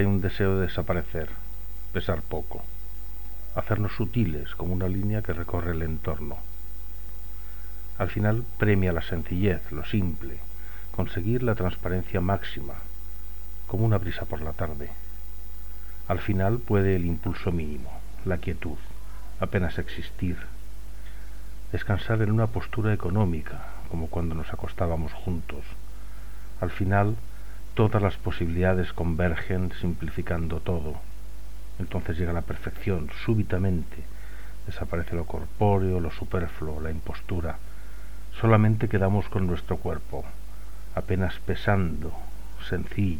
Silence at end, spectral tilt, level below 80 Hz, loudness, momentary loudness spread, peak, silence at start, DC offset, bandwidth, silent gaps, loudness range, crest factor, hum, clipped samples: 0 s; -8 dB/octave; -38 dBFS; -28 LUFS; 17 LU; -4 dBFS; 0 s; 4%; 19 kHz; none; 5 LU; 22 dB; 50 Hz at -40 dBFS; under 0.1%